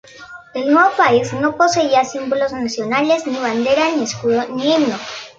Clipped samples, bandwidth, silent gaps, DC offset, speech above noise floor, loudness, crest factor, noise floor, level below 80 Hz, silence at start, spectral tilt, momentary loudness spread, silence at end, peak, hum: under 0.1%; 8.6 kHz; none; under 0.1%; 22 dB; -16 LUFS; 16 dB; -38 dBFS; -56 dBFS; 0.15 s; -4 dB/octave; 9 LU; 0.1 s; 0 dBFS; none